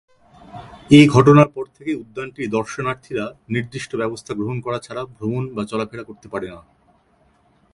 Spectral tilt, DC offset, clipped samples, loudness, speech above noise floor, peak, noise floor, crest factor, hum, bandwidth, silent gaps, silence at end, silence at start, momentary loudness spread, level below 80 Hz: -7 dB/octave; under 0.1%; under 0.1%; -19 LUFS; 40 dB; 0 dBFS; -59 dBFS; 20 dB; none; 11.5 kHz; none; 1.15 s; 0.55 s; 20 LU; -52 dBFS